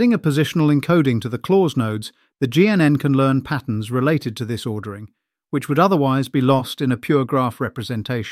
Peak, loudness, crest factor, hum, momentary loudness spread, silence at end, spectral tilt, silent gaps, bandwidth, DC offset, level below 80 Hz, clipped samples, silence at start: -2 dBFS; -19 LUFS; 16 dB; none; 11 LU; 0 s; -7 dB/octave; none; 15.5 kHz; under 0.1%; -56 dBFS; under 0.1%; 0 s